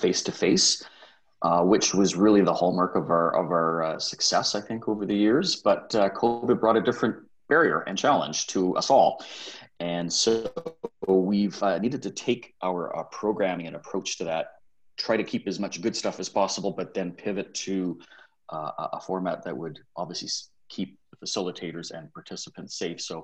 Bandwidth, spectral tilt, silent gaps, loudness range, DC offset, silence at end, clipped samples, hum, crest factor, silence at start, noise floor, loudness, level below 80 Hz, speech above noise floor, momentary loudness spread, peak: 9.4 kHz; -4 dB/octave; none; 10 LU; under 0.1%; 0 s; under 0.1%; none; 18 dB; 0 s; -45 dBFS; -26 LUFS; -64 dBFS; 20 dB; 15 LU; -8 dBFS